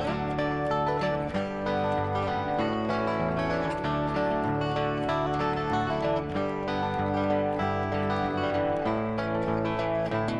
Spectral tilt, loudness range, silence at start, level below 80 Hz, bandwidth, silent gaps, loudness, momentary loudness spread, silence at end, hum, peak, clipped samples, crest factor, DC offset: -7.5 dB/octave; 0 LU; 0 s; -50 dBFS; 11 kHz; none; -28 LUFS; 2 LU; 0 s; none; -16 dBFS; under 0.1%; 12 dB; under 0.1%